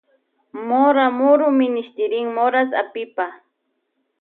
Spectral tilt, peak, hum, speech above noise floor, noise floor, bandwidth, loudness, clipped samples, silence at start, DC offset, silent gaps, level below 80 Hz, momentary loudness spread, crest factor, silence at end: -8.5 dB/octave; -4 dBFS; none; 54 dB; -72 dBFS; 4.1 kHz; -18 LUFS; under 0.1%; 0.55 s; under 0.1%; none; -82 dBFS; 12 LU; 16 dB; 0.85 s